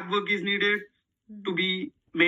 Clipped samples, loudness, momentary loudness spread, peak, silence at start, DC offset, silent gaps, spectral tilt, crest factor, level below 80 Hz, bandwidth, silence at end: under 0.1%; -27 LUFS; 10 LU; -8 dBFS; 0 s; under 0.1%; none; -5.5 dB/octave; 20 dB; -76 dBFS; 7.8 kHz; 0 s